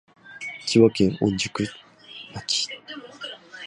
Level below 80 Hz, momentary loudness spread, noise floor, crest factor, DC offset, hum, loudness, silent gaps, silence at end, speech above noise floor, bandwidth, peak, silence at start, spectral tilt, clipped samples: -54 dBFS; 19 LU; -44 dBFS; 22 dB; under 0.1%; none; -22 LUFS; none; 0 s; 23 dB; 11.5 kHz; -4 dBFS; 0.25 s; -4.5 dB/octave; under 0.1%